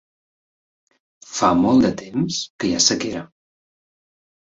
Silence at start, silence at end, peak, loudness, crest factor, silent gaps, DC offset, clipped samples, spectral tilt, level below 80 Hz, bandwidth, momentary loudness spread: 1.3 s; 1.35 s; -2 dBFS; -19 LUFS; 22 dB; 2.50-2.59 s; under 0.1%; under 0.1%; -3.5 dB/octave; -52 dBFS; 8 kHz; 12 LU